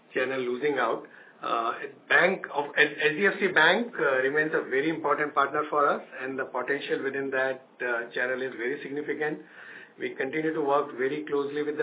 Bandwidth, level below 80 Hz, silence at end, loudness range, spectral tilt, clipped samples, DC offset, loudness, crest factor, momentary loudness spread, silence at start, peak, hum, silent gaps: 4 kHz; -86 dBFS; 0 s; 7 LU; -8 dB/octave; under 0.1%; under 0.1%; -27 LUFS; 20 dB; 11 LU; 0.1 s; -8 dBFS; none; none